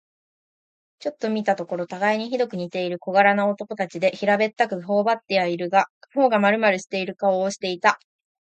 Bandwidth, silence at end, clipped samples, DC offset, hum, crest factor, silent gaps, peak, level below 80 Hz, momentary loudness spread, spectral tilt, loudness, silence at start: 8.8 kHz; 0.55 s; under 0.1%; under 0.1%; none; 20 dB; 5.90-6.01 s; -2 dBFS; -74 dBFS; 10 LU; -5 dB/octave; -22 LUFS; 1.05 s